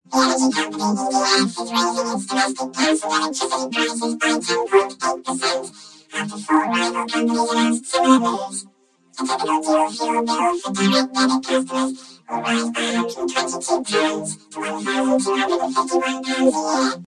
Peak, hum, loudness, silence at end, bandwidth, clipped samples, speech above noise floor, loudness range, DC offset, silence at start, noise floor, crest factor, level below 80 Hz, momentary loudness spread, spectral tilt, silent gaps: 0 dBFS; none; -20 LUFS; 0 s; 12 kHz; under 0.1%; 32 dB; 2 LU; under 0.1%; 0.1 s; -52 dBFS; 20 dB; -66 dBFS; 9 LU; -3 dB/octave; none